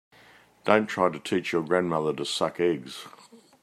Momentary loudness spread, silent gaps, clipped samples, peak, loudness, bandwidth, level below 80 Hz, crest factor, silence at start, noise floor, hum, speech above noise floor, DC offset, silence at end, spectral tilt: 13 LU; none; under 0.1%; -4 dBFS; -26 LUFS; 14 kHz; -70 dBFS; 24 dB; 0.65 s; -56 dBFS; none; 30 dB; under 0.1%; 0.25 s; -5 dB/octave